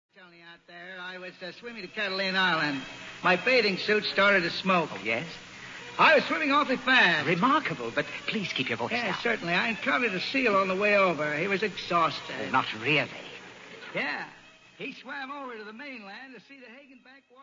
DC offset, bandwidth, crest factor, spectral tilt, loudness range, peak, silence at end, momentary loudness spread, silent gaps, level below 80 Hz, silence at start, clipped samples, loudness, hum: under 0.1%; 7.6 kHz; 20 dB; -4.5 dB/octave; 11 LU; -8 dBFS; 0.3 s; 18 LU; none; -68 dBFS; 0.2 s; under 0.1%; -26 LUFS; none